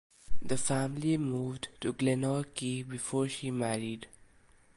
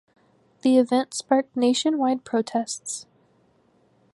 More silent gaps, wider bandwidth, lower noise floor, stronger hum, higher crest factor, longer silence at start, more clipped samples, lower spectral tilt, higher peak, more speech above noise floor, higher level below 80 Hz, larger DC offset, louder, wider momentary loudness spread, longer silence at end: neither; about the same, 11.5 kHz vs 11.5 kHz; about the same, -62 dBFS vs -62 dBFS; neither; about the same, 16 dB vs 18 dB; second, 0.3 s vs 0.65 s; neither; first, -5 dB/octave vs -3.5 dB/octave; second, -16 dBFS vs -6 dBFS; second, 29 dB vs 40 dB; first, -54 dBFS vs -76 dBFS; neither; second, -33 LUFS vs -23 LUFS; about the same, 10 LU vs 10 LU; second, 0.7 s vs 1.1 s